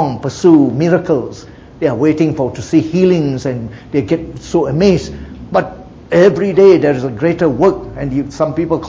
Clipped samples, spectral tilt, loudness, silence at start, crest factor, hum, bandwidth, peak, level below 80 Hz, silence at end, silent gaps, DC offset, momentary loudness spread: under 0.1%; -7.5 dB/octave; -13 LUFS; 0 s; 14 dB; none; 7.8 kHz; 0 dBFS; -38 dBFS; 0 s; none; under 0.1%; 10 LU